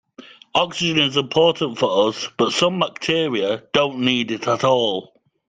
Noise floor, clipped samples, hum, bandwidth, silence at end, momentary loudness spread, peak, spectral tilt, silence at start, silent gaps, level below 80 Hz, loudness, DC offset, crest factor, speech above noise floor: -45 dBFS; under 0.1%; none; 9.4 kHz; 0.45 s; 5 LU; -2 dBFS; -4 dB/octave; 0.2 s; none; -60 dBFS; -19 LUFS; under 0.1%; 18 dB; 25 dB